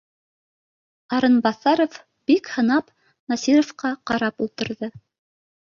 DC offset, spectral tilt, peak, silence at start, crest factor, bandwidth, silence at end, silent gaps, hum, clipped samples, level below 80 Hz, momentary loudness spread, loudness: under 0.1%; -4.5 dB/octave; -4 dBFS; 1.1 s; 18 dB; 7.2 kHz; 0.65 s; 3.19-3.27 s; none; under 0.1%; -62 dBFS; 10 LU; -22 LUFS